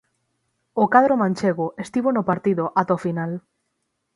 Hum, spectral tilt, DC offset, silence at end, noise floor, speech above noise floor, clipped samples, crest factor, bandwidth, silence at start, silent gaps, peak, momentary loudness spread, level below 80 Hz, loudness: none; -7.5 dB/octave; under 0.1%; 0.75 s; -75 dBFS; 55 dB; under 0.1%; 22 dB; 11.5 kHz; 0.75 s; none; 0 dBFS; 12 LU; -64 dBFS; -21 LUFS